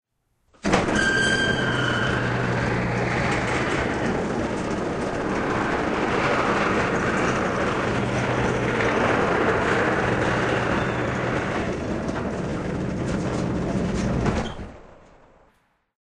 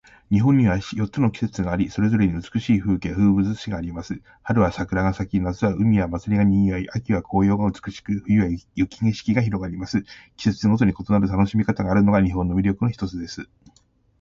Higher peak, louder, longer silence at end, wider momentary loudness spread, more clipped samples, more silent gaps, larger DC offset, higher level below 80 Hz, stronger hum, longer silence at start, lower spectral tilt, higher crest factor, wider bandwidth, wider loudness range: about the same, -4 dBFS vs -6 dBFS; about the same, -23 LUFS vs -22 LUFS; first, 1.05 s vs 0.75 s; second, 6 LU vs 10 LU; neither; neither; neither; about the same, -40 dBFS vs -40 dBFS; neither; first, 0.65 s vs 0.3 s; second, -5.5 dB/octave vs -8 dB/octave; about the same, 20 dB vs 16 dB; first, 10 kHz vs 7.4 kHz; about the same, 4 LU vs 2 LU